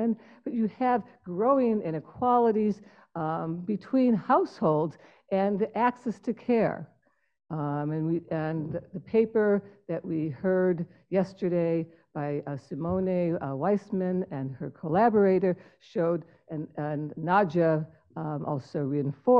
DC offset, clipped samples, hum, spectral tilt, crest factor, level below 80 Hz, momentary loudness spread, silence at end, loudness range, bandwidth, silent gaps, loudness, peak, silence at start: under 0.1%; under 0.1%; none; -9.5 dB/octave; 18 dB; -66 dBFS; 12 LU; 0 s; 3 LU; 7.4 kHz; none; -28 LUFS; -10 dBFS; 0 s